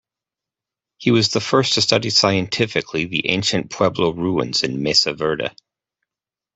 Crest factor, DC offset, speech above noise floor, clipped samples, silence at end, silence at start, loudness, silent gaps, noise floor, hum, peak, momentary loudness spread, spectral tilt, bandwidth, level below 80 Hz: 18 dB; under 0.1%; 70 dB; under 0.1%; 1.05 s; 1 s; -18 LUFS; none; -89 dBFS; none; -2 dBFS; 7 LU; -4 dB/octave; 8.4 kHz; -54 dBFS